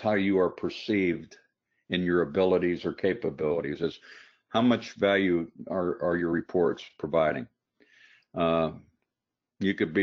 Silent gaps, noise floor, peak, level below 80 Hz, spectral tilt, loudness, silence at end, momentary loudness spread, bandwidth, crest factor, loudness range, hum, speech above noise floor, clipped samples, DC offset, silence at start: none; -88 dBFS; -10 dBFS; -60 dBFS; -5 dB/octave; -28 LUFS; 0 s; 9 LU; 7 kHz; 18 dB; 3 LU; none; 61 dB; under 0.1%; under 0.1%; 0 s